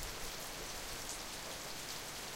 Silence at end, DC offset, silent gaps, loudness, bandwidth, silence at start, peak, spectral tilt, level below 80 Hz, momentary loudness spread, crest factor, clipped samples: 0 s; under 0.1%; none; -43 LUFS; 16.5 kHz; 0 s; -28 dBFS; -1.5 dB/octave; -54 dBFS; 1 LU; 16 dB; under 0.1%